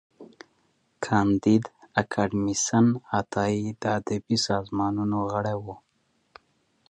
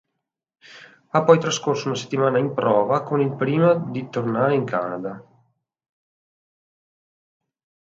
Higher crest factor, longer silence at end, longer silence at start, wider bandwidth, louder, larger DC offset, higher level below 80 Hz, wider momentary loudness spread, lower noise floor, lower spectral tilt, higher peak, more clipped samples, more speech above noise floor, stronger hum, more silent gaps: about the same, 20 dB vs 22 dB; second, 1.15 s vs 2.65 s; second, 0.2 s vs 0.7 s; first, 10.5 kHz vs 7.8 kHz; second, -26 LUFS vs -21 LUFS; neither; first, -56 dBFS vs -68 dBFS; second, 7 LU vs 10 LU; second, -68 dBFS vs -81 dBFS; about the same, -5 dB/octave vs -6 dB/octave; second, -6 dBFS vs 0 dBFS; neither; second, 44 dB vs 60 dB; neither; neither